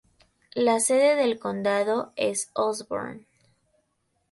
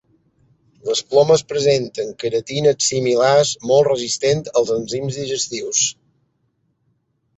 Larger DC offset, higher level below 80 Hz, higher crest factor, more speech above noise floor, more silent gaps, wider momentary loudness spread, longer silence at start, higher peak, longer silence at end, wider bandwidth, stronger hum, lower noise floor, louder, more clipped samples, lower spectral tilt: neither; second, -70 dBFS vs -58 dBFS; about the same, 18 dB vs 16 dB; about the same, 49 dB vs 49 dB; neither; first, 13 LU vs 9 LU; second, 0.55 s vs 0.85 s; second, -10 dBFS vs -2 dBFS; second, 1.1 s vs 1.45 s; first, 12 kHz vs 8.2 kHz; neither; first, -74 dBFS vs -67 dBFS; second, -25 LUFS vs -18 LUFS; neither; about the same, -3 dB/octave vs -3.5 dB/octave